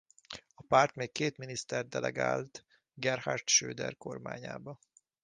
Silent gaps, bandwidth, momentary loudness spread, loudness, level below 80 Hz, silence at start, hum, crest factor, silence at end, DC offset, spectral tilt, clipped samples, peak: none; 10 kHz; 20 LU; -32 LUFS; -70 dBFS; 0.3 s; none; 24 dB; 0.5 s; under 0.1%; -2.5 dB/octave; under 0.1%; -10 dBFS